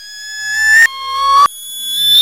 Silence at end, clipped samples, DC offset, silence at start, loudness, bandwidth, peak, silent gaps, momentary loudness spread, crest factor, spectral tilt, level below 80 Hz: 0 s; under 0.1%; 0.3%; 0 s; -10 LUFS; 16 kHz; 0 dBFS; none; 14 LU; 12 dB; 3 dB/octave; -52 dBFS